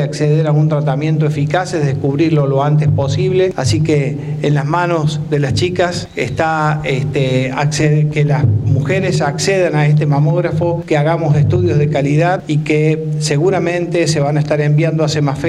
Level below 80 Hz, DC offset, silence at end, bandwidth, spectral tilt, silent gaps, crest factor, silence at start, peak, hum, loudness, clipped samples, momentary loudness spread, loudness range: -44 dBFS; under 0.1%; 0 s; 11 kHz; -6.5 dB/octave; none; 12 dB; 0 s; 0 dBFS; none; -14 LUFS; under 0.1%; 4 LU; 2 LU